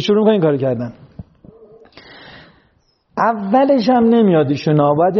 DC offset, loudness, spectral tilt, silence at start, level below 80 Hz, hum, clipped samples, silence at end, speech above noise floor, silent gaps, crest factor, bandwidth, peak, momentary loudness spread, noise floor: under 0.1%; -14 LUFS; -6 dB/octave; 0 s; -54 dBFS; none; under 0.1%; 0 s; 45 dB; none; 14 dB; 6.6 kHz; -2 dBFS; 9 LU; -59 dBFS